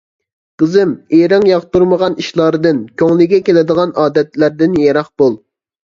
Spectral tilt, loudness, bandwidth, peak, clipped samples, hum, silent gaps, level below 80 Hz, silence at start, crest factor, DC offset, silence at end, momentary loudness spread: -7 dB/octave; -12 LUFS; 7.4 kHz; 0 dBFS; under 0.1%; none; none; -50 dBFS; 0.6 s; 12 dB; under 0.1%; 0.5 s; 5 LU